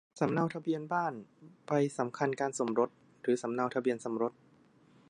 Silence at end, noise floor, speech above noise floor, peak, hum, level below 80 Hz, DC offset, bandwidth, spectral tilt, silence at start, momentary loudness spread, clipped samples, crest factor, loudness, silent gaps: 0.8 s; -64 dBFS; 31 dB; -14 dBFS; none; -80 dBFS; under 0.1%; 11.5 kHz; -6 dB/octave; 0.15 s; 5 LU; under 0.1%; 20 dB; -33 LUFS; none